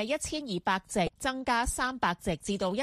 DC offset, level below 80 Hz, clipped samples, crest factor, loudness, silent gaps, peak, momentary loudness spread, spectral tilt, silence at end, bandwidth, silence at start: under 0.1%; -48 dBFS; under 0.1%; 18 dB; -31 LUFS; none; -14 dBFS; 4 LU; -3.5 dB/octave; 0 s; 15 kHz; 0 s